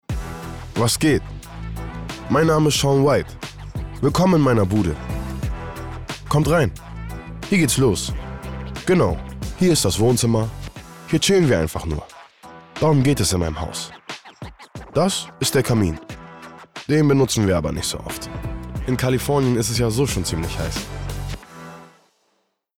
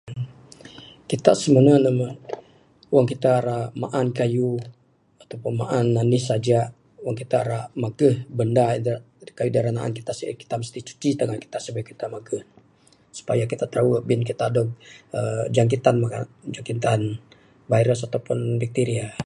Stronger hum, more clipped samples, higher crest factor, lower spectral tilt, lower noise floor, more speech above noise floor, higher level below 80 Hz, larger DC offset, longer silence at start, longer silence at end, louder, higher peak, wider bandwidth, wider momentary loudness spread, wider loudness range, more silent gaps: neither; neither; second, 12 dB vs 22 dB; second, -5 dB/octave vs -7 dB/octave; first, -69 dBFS vs -57 dBFS; first, 50 dB vs 35 dB; first, -36 dBFS vs -58 dBFS; neither; about the same, 0.1 s vs 0.05 s; first, 0.9 s vs 0 s; first, -20 LUFS vs -23 LUFS; second, -8 dBFS vs 0 dBFS; first, 17.5 kHz vs 11.5 kHz; first, 18 LU vs 15 LU; second, 4 LU vs 7 LU; neither